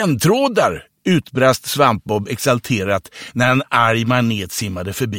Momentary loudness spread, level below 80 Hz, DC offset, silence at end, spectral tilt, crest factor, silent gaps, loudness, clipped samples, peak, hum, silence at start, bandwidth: 8 LU; -50 dBFS; under 0.1%; 0 s; -5 dB/octave; 16 dB; none; -17 LUFS; under 0.1%; 0 dBFS; none; 0 s; 17 kHz